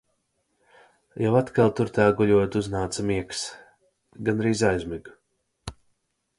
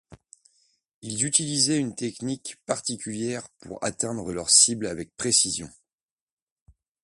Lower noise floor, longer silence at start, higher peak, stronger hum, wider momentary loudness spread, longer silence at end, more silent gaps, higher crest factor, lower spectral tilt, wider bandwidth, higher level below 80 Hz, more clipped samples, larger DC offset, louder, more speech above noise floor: second, -73 dBFS vs under -90 dBFS; first, 1.15 s vs 0.1 s; about the same, -6 dBFS vs -4 dBFS; neither; first, 21 LU vs 17 LU; second, 0.65 s vs 1.35 s; second, none vs 0.94-1.02 s; about the same, 20 dB vs 24 dB; first, -6 dB/octave vs -2 dB/octave; about the same, 11.5 kHz vs 11.5 kHz; first, -50 dBFS vs -60 dBFS; neither; neither; about the same, -24 LUFS vs -24 LUFS; second, 50 dB vs over 64 dB